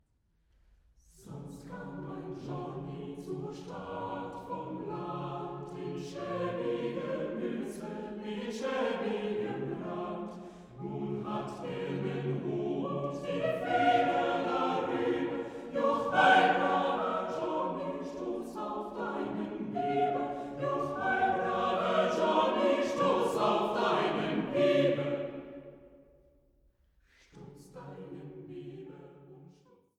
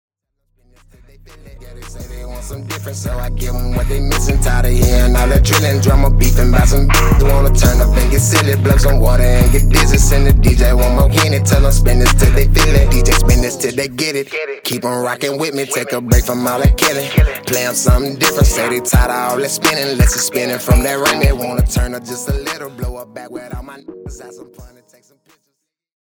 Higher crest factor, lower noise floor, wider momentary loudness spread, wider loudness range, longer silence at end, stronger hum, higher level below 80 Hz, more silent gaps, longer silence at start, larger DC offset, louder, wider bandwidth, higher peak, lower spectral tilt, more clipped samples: first, 22 dB vs 12 dB; about the same, -73 dBFS vs -71 dBFS; first, 18 LU vs 14 LU; about the same, 14 LU vs 12 LU; second, 0.55 s vs 1.4 s; neither; second, -66 dBFS vs -14 dBFS; neither; second, 1.2 s vs 1.55 s; neither; second, -32 LUFS vs -14 LUFS; second, 13.5 kHz vs 19.5 kHz; second, -12 dBFS vs 0 dBFS; first, -6 dB/octave vs -4.5 dB/octave; neither